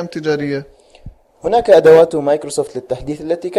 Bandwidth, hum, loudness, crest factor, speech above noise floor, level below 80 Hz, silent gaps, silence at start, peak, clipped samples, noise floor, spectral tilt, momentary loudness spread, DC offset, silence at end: 12 kHz; none; -14 LUFS; 14 dB; 25 dB; -44 dBFS; none; 0 s; 0 dBFS; under 0.1%; -39 dBFS; -5.5 dB/octave; 16 LU; under 0.1%; 0 s